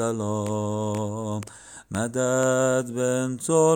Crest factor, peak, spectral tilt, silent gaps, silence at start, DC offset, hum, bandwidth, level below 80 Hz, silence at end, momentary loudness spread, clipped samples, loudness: 16 dB; -8 dBFS; -5.5 dB/octave; none; 0 s; under 0.1%; none; 17.5 kHz; -64 dBFS; 0 s; 12 LU; under 0.1%; -25 LUFS